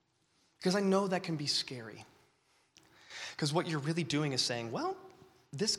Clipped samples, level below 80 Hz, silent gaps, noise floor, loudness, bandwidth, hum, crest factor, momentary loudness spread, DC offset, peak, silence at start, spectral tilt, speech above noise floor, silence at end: under 0.1%; -76 dBFS; none; -74 dBFS; -34 LUFS; 14.5 kHz; none; 20 dB; 17 LU; under 0.1%; -16 dBFS; 0.6 s; -4 dB/octave; 40 dB; 0 s